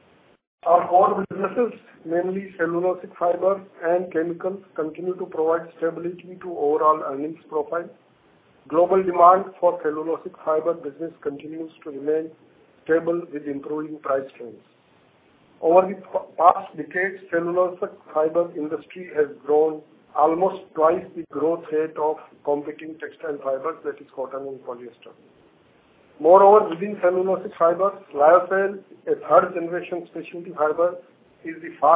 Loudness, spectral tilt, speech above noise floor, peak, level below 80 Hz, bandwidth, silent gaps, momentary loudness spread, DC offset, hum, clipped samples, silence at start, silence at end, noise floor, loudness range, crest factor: -22 LUFS; -10 dB/octave; 36 dB; 0 dBFS; -70 dBFS; 3.9 kHz; none; 17 LU; under 0.1%; none; under 0.1%; 0.65 s; 0 s; -58 dBFS; 8 LU; 22 dB